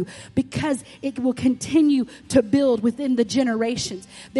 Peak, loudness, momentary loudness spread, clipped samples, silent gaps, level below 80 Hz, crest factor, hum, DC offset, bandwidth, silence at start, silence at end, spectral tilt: -4 dBFS; -22 LUFS; 9 LU; under 0.1%; none; -52 dBFS; 18 dB; none; under 0.1%; 11.5 kHz; 0 s; 0 s; -5 dB/octave